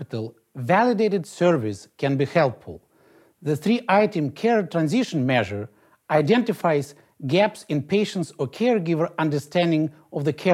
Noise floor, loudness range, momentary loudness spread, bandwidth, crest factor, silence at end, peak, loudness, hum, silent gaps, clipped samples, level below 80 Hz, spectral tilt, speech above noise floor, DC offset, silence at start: -57 dBFS; 2 LU; 13 LU; 15 kHz; 18 dB; 0 s; -6 dBFS; -23 LUFS; none; none; under 0.1%; -66 dBFS; -6.5 dB/octave; 35 dB; under 0.1%; 0 s